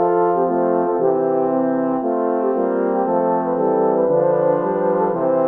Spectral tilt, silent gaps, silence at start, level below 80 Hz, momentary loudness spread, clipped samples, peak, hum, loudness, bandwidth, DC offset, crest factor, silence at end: -11.5 dB/octave; none; 0 s; -66 dBFS; 3 LU; under 0.1%; -4 dBFS; none; -18 LUFS; 3.1 kHz; under 0.1%; 12 dB; 0 s